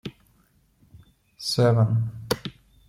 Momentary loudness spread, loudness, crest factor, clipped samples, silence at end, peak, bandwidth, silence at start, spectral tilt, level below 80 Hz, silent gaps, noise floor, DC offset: 17 LU; -24 LUFS; 18 dB; under 0.1%; 0.4 s; -8 dBFS; 16.5 kHz; 0.05 s; -6 dB/octave; -56 dBFS; none; -63 dBFS; under 0.1%